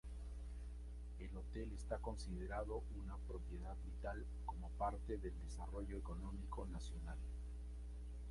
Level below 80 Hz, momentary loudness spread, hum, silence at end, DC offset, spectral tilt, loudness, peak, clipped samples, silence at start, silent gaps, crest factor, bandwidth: -48 dBFS; 7 LU; 60 Hz at -50 dBFS; 0 s; under 0.1%; -7 dB/octave; -50 LUFS; -28 dBFS; under 0.1%; 0.05 s; none; 18 dB; 11.5 kHz